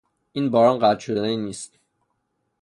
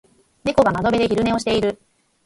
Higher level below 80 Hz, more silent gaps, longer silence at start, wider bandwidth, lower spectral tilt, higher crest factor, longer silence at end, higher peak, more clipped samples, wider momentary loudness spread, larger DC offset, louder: second, -64 dBFS vs -44 dBFS; neither; about the same, 0.35 s vs 0.45 s; about the same, 11.5 kHz vs 11.5 kHz; about the same, -5.5 dB/octave vs -5.5 dB/octave; about the same, 18 dB vs 18 dB; first, 0.95 s vs 0.5 s; about the same, -4 dBFS vs -2 dBFS; neither; first, 18 LU vs 9 LU; neither; about the same, -21 LUFS vs -19 LUFS